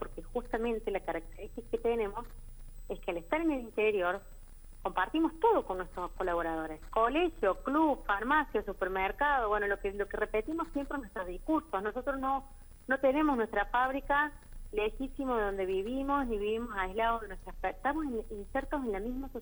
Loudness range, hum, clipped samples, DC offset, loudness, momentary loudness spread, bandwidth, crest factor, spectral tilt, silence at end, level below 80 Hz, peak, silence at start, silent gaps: 4 LU; none; under 0.1%; under 0.1%; -33 LUFS; 10 LU; over 20 kHz; 18 dB; -6 dB/octave; 0 s; -46 dBFS; -16 dBFS; 0 s; none